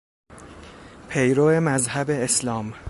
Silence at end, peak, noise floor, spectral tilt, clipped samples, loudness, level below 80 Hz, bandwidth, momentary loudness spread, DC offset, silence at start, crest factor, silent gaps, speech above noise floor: 0 s; -8 dBFS; -43 dBFS; -4.5 dB/octave; under 0.1%; -21 LUFS; -52 dBFS; 12 kHz; 10 LU; under 0.1%; 0.3 s; 16 dB; none; 22 dB